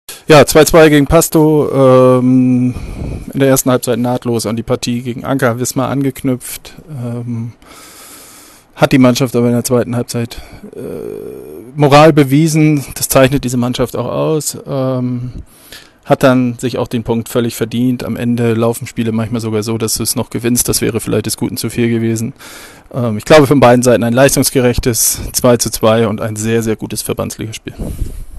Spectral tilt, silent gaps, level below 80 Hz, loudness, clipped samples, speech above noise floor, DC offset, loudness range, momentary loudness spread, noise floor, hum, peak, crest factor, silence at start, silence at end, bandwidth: -5 dB/octave; none; -34 dBFS; -12 LUFS; 0.2%; 27 dB; under 0.1%; 6 LU; 17 LU; -40 dBFS; none; 0 dBFS; 12 dB; 0.1 s; 0 s; 13 kHz